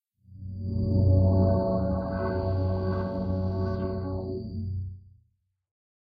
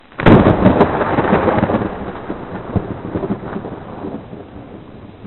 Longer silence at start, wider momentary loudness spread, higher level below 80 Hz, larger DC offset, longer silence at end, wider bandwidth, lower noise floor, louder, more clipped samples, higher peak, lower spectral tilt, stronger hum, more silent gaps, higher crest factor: first, 0.3 s vs 0.1 s; second, 13 LU vs 24 LU; second, -42 dBFS vs -34 dBFS; neither; first, 1.15 s vs 0 s; first, 5 kHz vs 4.3 kHz; first, -71 dBFS vs -35 dBFS; second, -28 LUFS vs -15 LUFS; neither; second, -12 dBFS vs 0 dBFS; first, -11.5 dB/octave vs -10 dB/octave; neither; neither; about the same, 16 dB vs 16 dB